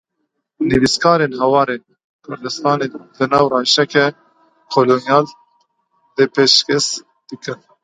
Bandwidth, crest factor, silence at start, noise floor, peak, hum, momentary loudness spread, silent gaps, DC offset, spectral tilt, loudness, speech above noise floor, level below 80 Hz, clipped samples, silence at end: 10.5 kHz; 18 dB; 0.6 s; -72 dBFS; 0 dBFS; none; 16 LU; 2.04-2.19 s; under 0.1%; -3.5 dB/octave; -15 LUFS; 57 dB; -50 dBFS; under 0.1%; 0.3 s